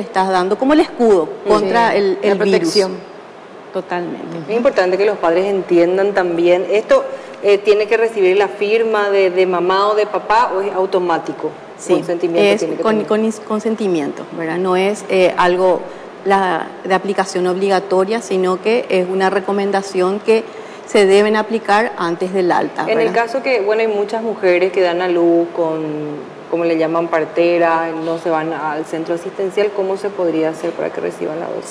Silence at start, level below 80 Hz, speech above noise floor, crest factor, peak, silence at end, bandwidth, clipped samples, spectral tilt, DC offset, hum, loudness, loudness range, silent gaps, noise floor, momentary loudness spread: 0 s; -58 dBFS; 20 dB; 12 dB; -2 dBFS; 0 s; 11 kHz; under 0.1%; -5.5 dB/octave; under 0.1%; none; -16 LUFS; 3 LU; none; -36 dBFS; 9 LU